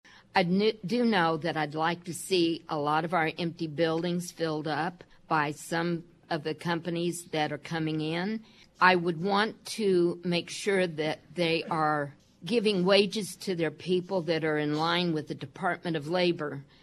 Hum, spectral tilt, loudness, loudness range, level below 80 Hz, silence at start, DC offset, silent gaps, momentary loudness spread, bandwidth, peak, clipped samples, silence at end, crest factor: none; -5 dB/octave; -29 LUFS; 4 LU; -72 dBFS; 0.35 s; under 0.1%; none; 9 LU; 13 kHz; -6 dBFS; under 0.1%; 0.2 s; 24 dB